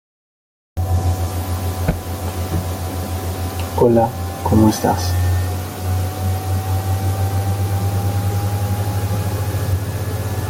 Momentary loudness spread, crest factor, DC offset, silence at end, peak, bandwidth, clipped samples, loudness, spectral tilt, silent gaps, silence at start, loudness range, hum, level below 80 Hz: 9 LU; 18 dB; under 0.1%; 0 s; -2 dBFS; 17 kHz; under 0.1%; -20 LUFS; -6.5 dB/octave; none; 0.75 s; 4 LU; none; -38 dBFS